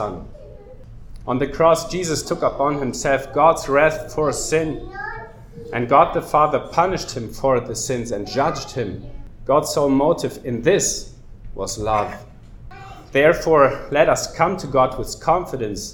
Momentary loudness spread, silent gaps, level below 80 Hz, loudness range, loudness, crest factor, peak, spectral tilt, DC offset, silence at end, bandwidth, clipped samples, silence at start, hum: 15 LU; none; -40 dBFS; 3 LU; -19 LUFS; 20 dB; 0 dBFS; -4.5 dB/octave; under 0.1%; 0 s; 19 kHz; under 0.1%; 0 s; none